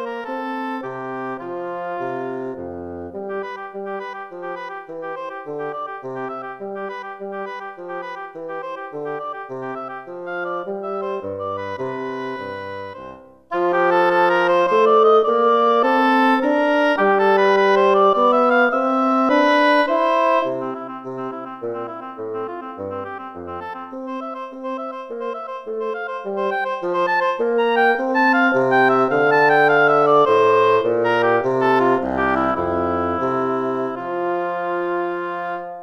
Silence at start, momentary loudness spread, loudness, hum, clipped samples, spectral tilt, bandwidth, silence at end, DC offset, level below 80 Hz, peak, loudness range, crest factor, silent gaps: 0 s; 16 LU; -19 LUFS; none; under 0.1%; -6 dB/octave; 7.6 kHz; 0 s; under 0.1%; -56 dBFS; -4 dBFS; 14 LU; 16 dB; none